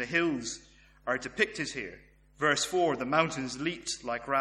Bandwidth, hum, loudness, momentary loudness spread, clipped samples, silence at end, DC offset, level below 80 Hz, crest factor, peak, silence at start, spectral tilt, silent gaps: 13 kHz; none; -30 LUFS; 12 LU; under 0.1%; 0 s; under 0.1%; -62 dBFS; 22 dB; -10 dBFS; 0 s; -3.5 dB/octave; none